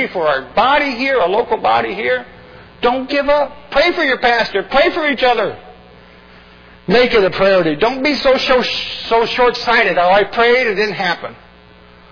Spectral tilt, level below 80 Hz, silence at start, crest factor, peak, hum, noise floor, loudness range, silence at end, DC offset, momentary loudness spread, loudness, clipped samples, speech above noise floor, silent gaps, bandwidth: -5 dB/octave; -42 dBFS; 0 s; 14 dB; -2 dBFS; none; -43 dBFS; 3 LU; 0.75 s; under 0.1%; 7 LU; -14 LUFS; under 0.1%; 29 dB; none; 5.4 kHz